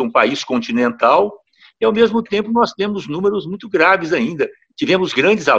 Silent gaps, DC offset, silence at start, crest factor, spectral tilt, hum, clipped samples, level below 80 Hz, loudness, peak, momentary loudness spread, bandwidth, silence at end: none; under 0.1%; 0 s; 16 dB; -5 dB/octave; none; under 0.1%; -56 dBFS; -16 LUFS; 0 dBFS; 9 LU; 8 kHz; 0 s